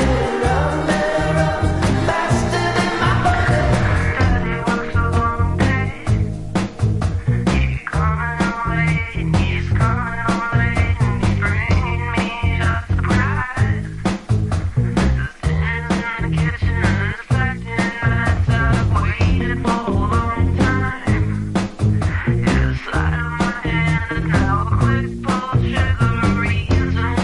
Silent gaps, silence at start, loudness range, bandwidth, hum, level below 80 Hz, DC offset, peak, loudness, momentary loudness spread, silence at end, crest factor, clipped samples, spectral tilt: none; 0 s; 2 LU; 11.5 kHz; none; -26 dBFS; under 0.1%; -4 dBFS; -19 LUFS; 4 LU; 0 s; 12 dB; under 0.1%; -6.5 dB/octave